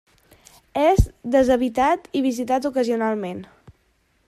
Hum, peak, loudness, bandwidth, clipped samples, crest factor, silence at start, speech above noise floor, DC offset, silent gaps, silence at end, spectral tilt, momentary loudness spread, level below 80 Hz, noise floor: none; -2 dBFS; -21 LUFS; 15 kHz; under 0.1%; 20 dB; 0.75 s; 44 dB; under 0.1%; none; 0.8 s; -6.5 dB/octave; 10 LU; -34 dBFS; -64 dBFS